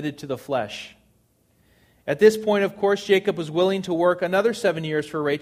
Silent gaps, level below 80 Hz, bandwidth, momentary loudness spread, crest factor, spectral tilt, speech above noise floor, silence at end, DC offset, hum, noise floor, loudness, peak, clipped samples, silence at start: none; -64 dBFS; 15 kHz; 14 LU; 20 dB; -5.5 dB/octave; 41 dB; 0 s; under 0.1%; none; -63 dBFS; -22 LUFS; -2 dBFS; under 0.1%; 0 s